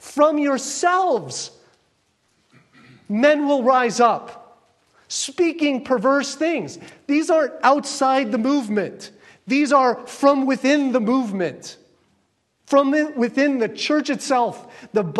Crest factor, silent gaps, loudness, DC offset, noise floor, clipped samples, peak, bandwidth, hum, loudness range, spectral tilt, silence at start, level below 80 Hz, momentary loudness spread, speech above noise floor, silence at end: 18 dB; none; -20 LUFS; under 0.1%; -67 dBFS; under 0.1%; -2 dBFS; 12.5 kHz; none; 2 LU; -4 dB/octave; 0.05 s; -72 dBFS; 12 LU; 48 dB; 0 s